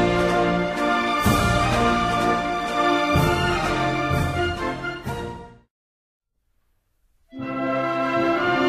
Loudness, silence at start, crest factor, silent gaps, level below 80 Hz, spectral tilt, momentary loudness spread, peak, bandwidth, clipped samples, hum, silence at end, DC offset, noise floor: -22 LUFS; 0 s; 16 dB; 5.70-6.20 s; -38 dBFS; -5.5 dB/octave; 11 LU; -6 dBFS; 15.5 kHz; under 0.1%; none; 0 s; under 0.1%; -68 dBFS